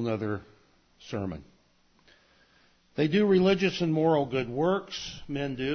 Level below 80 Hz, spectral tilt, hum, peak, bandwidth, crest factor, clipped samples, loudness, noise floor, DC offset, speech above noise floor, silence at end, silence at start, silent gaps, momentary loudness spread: -58 dBFS; -6.5 dB/octave; none; -12 dBFS; 6.6 kHz; 16 dB; under 0.1%; -28 LUFS; -65 dBFS; under 0.1%; 38 dB; 0 s; 0 s; none; 15 LU